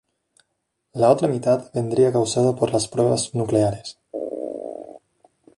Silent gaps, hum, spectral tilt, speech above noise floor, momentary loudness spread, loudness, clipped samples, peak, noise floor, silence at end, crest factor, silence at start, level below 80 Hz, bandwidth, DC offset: none; none; -6 dB/octave; 56 dB; 15 LU; -21 LUFS; under 0.1%; -4 dBFS; -75 dBFS; 0.6 s; 18 dB; 0.95 s; -56 dBFS; 11.5 kHz; under 0.1%